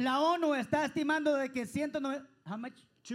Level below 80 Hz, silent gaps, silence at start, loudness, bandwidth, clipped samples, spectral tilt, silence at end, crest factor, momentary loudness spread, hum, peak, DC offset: -74 dBFS; none; 0 s; -33 LUFS; 15.5 kHz; under 0.1%; -5 dB/octave; 0 s; 16 dB; 13 LU; none; -18 dBFS; under 0.1%